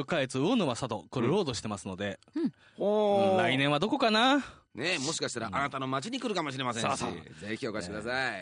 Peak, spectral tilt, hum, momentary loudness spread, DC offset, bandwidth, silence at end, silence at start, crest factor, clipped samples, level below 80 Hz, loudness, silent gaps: -12 dBFS; -4.5 dB/octave; none; 11 LU; under 0.1%; 10 kHz; 0 s; 0 s; 18 dB; under 0.1%; -66 dBFS; -30 LUFS; none